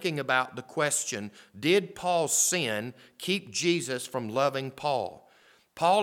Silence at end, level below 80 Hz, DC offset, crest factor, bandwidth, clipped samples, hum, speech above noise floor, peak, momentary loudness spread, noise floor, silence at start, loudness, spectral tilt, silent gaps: 0 s; -74 dBFS; under 0.1%; 20 dB; 18.5 kHz; under 0.1%; none; 32 dB; -10 dBFS; 10 LU; -61 dBFS; 0 s; -28 LUFS; -3 dB/octave; none